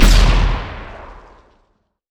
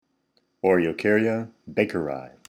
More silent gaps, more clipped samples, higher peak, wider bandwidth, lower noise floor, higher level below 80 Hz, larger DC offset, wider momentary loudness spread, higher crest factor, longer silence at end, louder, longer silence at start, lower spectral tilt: neither; neither; first, 0 dBFS vs -6 dBFS; first, 20 kHz vs 15 kHz; second, -63 dBFS vs -70 dBFS; first, -16 dBFS vs -62 dBFS; neither; first, 24 LU vs 9 LU; about the same, 16 dB vs 18 dB; first, 1.05 s vs 0.2 s; first, -17 LUFS vs -24 LUFS; second, 0 s vs 0.65 s; second, -4.5 dB/octave vs -7 dB/octave